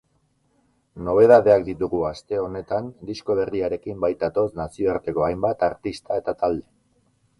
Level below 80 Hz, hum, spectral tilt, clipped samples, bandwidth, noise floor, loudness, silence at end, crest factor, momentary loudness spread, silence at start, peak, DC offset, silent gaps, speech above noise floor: -50 dBFS; none; -7.5 dB/octave; under 0.1%; 11.5 kHz; -66 dBFS; -22 LUFS; 0.8 s; 20 dB; 13 LU; 0.95 s; -2 dBFS; under 0.1%; none; 45 dB